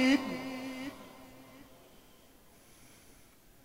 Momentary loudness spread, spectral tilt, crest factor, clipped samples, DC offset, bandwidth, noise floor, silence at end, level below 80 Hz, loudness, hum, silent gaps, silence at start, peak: 24 LU; -4 dB/octave; 20 dB; under 0.1%; under 0.1%; 16 kHz; -60 dBFS; 2 s; -66 dBFS; -35 LUFS; none; none; 0 s; -16 dBFS